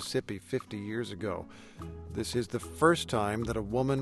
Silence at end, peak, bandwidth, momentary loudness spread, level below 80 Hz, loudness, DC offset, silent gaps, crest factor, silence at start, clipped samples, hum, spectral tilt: 0 s; -12 dBFS; 12.5 kHz; 16 LU; -52 dBFS; -32 LUFS; under 0.1%; none; 22 dB; 0 s; under 0.1%; none; -5.5 dB/octave